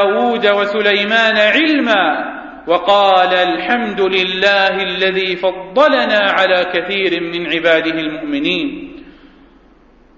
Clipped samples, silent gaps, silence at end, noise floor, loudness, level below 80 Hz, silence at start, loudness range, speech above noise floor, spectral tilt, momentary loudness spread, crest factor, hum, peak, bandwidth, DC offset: under 0.1%; none; 1.05 s; -47 dBFS; -13 LUFS; -50 dBFS; 0 s; 4 LU; 33 dB; -4.5 dB/octave; 8 LU; 14 dB; none; 0 dBFS; 7.6 kHz; under 0.1%